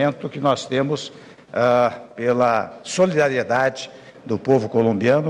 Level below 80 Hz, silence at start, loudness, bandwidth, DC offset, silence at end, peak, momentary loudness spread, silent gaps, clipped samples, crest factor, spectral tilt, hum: -60 dBFS; 0 s; -20 LUFS; 11 kHz; under 0.1%; 0 s; -6 dBFS; 11 LU; none; under 0.1%; 14 dB; -5.5 dB/octave; none